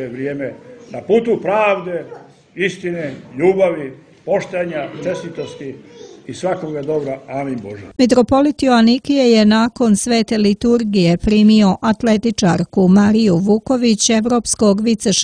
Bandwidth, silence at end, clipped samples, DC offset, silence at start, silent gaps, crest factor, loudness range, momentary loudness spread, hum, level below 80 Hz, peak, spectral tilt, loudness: 10.5 kHz; 0 s; under 0.1%; under 0.1%; 0 s; none; 16 dB; 9 LU; 16 LU; none; -42 dBFS; 0 dBFS; -5 dB/octave; -15 LUFS